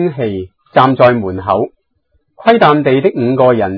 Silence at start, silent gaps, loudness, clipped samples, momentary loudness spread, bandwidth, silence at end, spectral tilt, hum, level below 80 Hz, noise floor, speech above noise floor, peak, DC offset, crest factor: 0 s; none; -12 LUFS; 0.5%; 11 LU; 5.4 kHz; 0 s; -9 dB/octave; none; -48 dBFS; -61 dBFS; 50 dB; 0 dBFS; under 0.1%; 12 dB